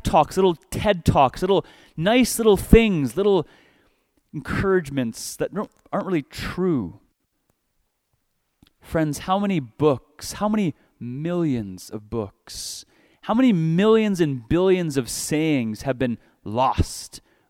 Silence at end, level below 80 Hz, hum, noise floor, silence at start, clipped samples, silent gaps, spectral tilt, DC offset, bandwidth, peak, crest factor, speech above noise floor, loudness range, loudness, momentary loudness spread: 0.3 s; -36 dBFS; none; -72 dBFS; 0.05 s; under 0.1%; none; -5.5 dB/octave; under 0.1%; 17 kHz; 0 dBFS; 22 dB; 50 dB; 9 LU; -22 LUFS; 16 LU